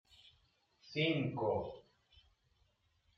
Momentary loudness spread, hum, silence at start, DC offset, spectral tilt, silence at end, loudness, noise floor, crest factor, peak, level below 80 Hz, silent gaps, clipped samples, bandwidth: 14 LU; none; 0.85 s; under 0.1%; -7 dB/octave; 1.4 s; -37 LUFS; -76 dBFS; 20 dB; -22 dBFS; -72 dBFS; none; under 0.1%; 7.4 kHz